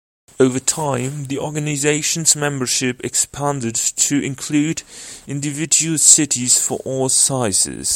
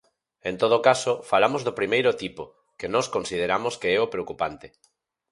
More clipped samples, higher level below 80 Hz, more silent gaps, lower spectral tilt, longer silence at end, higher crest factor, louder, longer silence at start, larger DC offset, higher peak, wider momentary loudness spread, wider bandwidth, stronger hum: neither; first, -54 dBFS vs -60 dBFS; neither; second, -2.5 dB/octave vs -4 dB/octave; second, 0 s vs 0.65 s; about the same, 18 dB vs 22 dB; first, -16 LUFS vs -24 LUFS; about the same, 0.4 s vs 0.45 s; neither; about the same, 0 dBFS vs -2 dBFS; about the same, 13 LU vs 15 LU; first, 16.5 kHz vs 11.5 kHz; neither